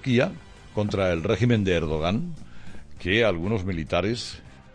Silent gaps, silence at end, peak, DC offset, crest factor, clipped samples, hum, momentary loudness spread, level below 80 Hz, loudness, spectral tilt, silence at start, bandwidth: none; 0.05 s; -8 dBFS; under 0.1%; 18 dB; under 0.1%; none; 14 LU; -44 dBFS; -25 LUFS; -6.5 dB/octave; 0 s; 10 kHz